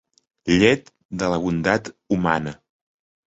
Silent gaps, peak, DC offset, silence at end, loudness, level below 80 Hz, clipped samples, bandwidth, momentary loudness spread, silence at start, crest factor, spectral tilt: 1.05-1.09 s; -4 dBFS; under 0.1%; 0.7 s; -21 LUFS; -48 dBFS; under 0.1%; 8 kHz; 14 LU; 0.45 s; 20 dB; -5.5 dB/octave